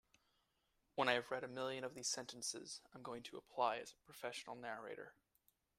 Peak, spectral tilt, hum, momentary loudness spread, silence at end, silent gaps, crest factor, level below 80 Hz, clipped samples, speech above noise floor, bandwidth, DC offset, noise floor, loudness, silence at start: -20 dBFS; -2 dB/octave; none; 14 LU; 0.65 s; none; 28 dB; -84 dBFS; under 0.1%; 38 dB; 15.5 kHz; under 0.1%; -83 dBFS; -44 LUFS; 0.95 s